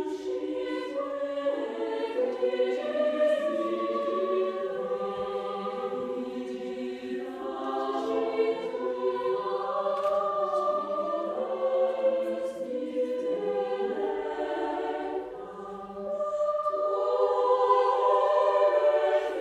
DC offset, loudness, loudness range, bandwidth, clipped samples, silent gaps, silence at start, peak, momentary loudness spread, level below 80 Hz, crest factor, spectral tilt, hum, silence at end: under 0.1%; -29 LUFS; 6 LU; 10 kHz; under 0.1%; none; 0 s; -10 dBFS; 11 LU; -70 dBFS; 18 dB; -5.5 dB/octave; none; 0 s